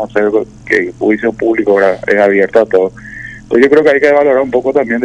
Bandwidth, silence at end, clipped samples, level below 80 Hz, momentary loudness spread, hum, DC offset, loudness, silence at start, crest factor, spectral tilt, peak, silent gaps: 10 kHz; 0 s; 1%; -44 dBFS; 8 LU; none; under 0.1%; -11 LUFS; 0 s; 10 dB; -6.5 dB/octave; 0 dBFS; none